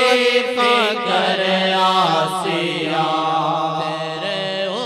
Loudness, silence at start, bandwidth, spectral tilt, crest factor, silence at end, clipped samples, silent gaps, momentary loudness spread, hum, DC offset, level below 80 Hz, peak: -18 LUFS; 0 s; 15.5 kHz; -4 dB/octave; 16 dB; 0 s; under 0.1%; none; 7 LU; none; under 0.1%; -68 dBFS; -2 dBFS